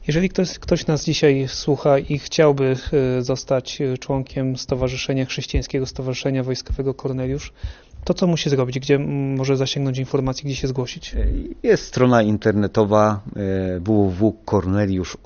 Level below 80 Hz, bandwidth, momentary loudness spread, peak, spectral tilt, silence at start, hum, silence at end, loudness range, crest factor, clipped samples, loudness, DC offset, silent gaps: -34 dBFS; 7 kHz; 8 LU; -2 dBFS; -6 dB/octave; 0 s; none; 0.1 s; 5 LU; 18 dB; under 0.1%; -21 LUFS; under 0.1%; none